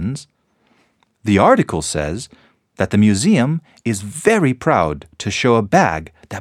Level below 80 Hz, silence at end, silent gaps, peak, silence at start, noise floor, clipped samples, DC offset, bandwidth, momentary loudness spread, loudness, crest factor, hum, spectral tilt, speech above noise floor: -44 dBFS; 0 s; none; 0 dBFS; 0 s; -60 dBFS; under 0.1%; under 0.1%; 13.5 kHz; 14 LU; -17 LUFS; 18 dB; none; -5.5 dB/octave; 44 dB